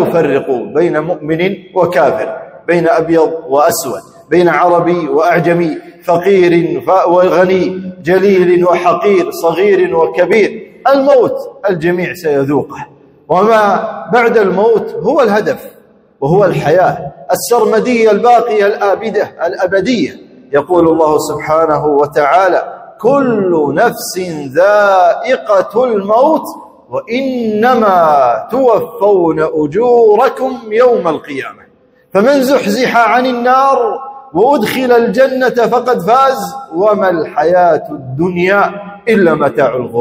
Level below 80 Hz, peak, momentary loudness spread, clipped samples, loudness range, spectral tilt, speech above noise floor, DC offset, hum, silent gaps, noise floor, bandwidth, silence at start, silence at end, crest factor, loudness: -52 dBFS; 0 dBFS; 8 LU; 0.2%; 2 LU; -6 dB/octave; 36 dB; under 0.1%; none; none; -47 dBFS; 16.5 kHz; 0 s; 0 s; 10 dB; -11 LUFS